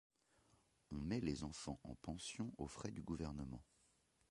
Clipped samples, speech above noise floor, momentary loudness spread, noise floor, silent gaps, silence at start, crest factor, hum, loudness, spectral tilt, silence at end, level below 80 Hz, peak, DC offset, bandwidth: under 0.1%; 31 dB; 9 LU; -78 dBFS; none; 0.9 s; 20 dB; none; -48 LUFS; -5.5 dB/octave; 0.65 s; -62 dBFS; -28 dBFS; under 0.1%; 11.5 kHz